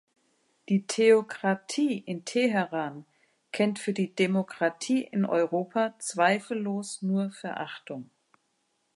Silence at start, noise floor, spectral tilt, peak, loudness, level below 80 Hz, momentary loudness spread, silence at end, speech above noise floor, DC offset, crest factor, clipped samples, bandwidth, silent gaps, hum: 0.7 s; -75 dBFS; -5 dB/octave; -10 dBFS; -28 LUFS; -82 dBFS; 13 LU; 0.9 s; 47 dB; under 0.1%; 18 dB; under 0.1%; 11.5 kHz; none; none